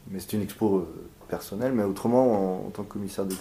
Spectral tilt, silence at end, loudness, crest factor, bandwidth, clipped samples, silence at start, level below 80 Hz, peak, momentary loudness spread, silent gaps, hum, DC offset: -6.5 dB/octave; 0 s; -27 LUFS; 18 dB; 16 kHz; under 0.1%; 0.05 s; -56 dBFS; -8 dBFS; 14 LU; none; none; under 0.1%